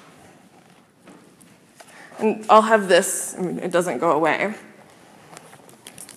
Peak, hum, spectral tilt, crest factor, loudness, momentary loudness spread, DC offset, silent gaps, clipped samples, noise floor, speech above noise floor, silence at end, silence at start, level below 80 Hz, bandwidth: 0 dBFS; none; -3.5 dB/octave; 22 dB; -19 LUFS; 15 LU; under 0.1%; none; under 0.1%; -52 dBFS; 33 dB; 0.1 s; 2.15 s; -74 dBFS; 15.5 kHz